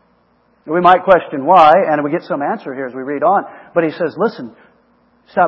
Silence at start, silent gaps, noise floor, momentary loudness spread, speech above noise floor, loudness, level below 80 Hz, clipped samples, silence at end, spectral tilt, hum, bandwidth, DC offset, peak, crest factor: 0.65 s; none; -56 dBFS; 14 LU; 42 dB; -14 LUFS; -56 dBFS; 0.2%; 0 s; -7.5 dB/octave; none; 7 kHz; under 0.1%; 0 dBFS; 14 dB